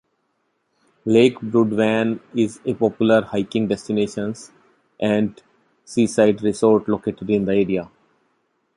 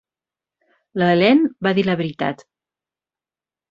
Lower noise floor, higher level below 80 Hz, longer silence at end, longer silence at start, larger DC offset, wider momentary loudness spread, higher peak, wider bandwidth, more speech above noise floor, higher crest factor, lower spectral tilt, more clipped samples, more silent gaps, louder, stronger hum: second, -70 dBFS vs under -90 dBFS; first, -56 dBFS vs -62 dBFS; second, 0.9 s vs 1.35 s; about the same, 1.05 s vs 0.95 s; neither; second, 10 LU vs 13 LU; about the same, -2 dBFS vs -2 dBFS; first, 11.5 kHz vs 7.4 kHz; second, 51 dB vs over 73 dB; about the same, 18 dB vs 20 dB; second, -6.5 dB/octave vs -8 dB/octave; neither; neither; about the same, -20 LUFS vs -18 LUFS; neither